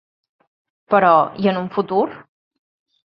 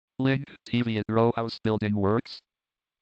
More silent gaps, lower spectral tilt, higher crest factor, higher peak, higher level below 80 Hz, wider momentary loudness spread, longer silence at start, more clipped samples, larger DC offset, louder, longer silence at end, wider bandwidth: neither; about the same, -9.5 dB/octave vs -8.5 dB/octave; about the same, 18 dB vs 18 dB; first, -2 dBFS vs -10 dBFS; about the same, -64 dBFS vs -62 dBFS; about the same, 8 LU vs 6 LU; first, 0.9 s vs 0.2 s; neither; neither; first, -17 LUFS vs -27 LUFS; first, 0.85 s vs 0.6 s; second, 5.8 kHz vs 8.2 kHz